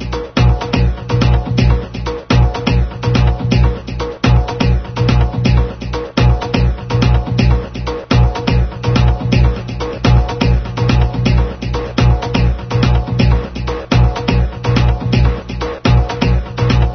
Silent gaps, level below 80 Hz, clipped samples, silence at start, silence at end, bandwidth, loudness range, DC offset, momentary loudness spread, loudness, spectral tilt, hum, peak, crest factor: none; -18 dBFS; under 0.1%; 0 s; 0 s; 6.4 kHz; 1 LU; 0.1%; 6 LU; -15 LUFS; -7 dB/octave; none; 0 dBFS; 14 dB